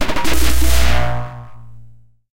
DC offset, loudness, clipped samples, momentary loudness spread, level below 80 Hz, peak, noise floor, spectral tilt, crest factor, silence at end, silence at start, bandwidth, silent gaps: under 0.1%; -18 LUFS; under 0.1%; 18 LU; -22 dBFS; -2 dBFS; -44 dBFS; -4 dB/octave; 12 dB; 0 s; 0 s; 17 kHz; none